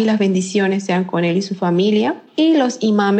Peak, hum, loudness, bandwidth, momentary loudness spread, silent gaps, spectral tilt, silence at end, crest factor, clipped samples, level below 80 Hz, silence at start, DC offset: -4 dBFS; none; -17 LUFS; 8.8 kHz; 4 LU; none; -6 dB/octave; 0 s; 12 dB; under 0.1%; -74 dBFS; 0 s; under 0.1%